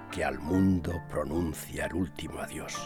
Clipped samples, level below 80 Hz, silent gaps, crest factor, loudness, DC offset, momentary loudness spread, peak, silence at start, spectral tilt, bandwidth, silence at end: under 0.1%; -48 dBFS; none; 16 dB; -32 LUFS; under 0.1%; 11 LU; -14 dBFS; 0 s; -6 dB/octave; 18 kHz; 0 s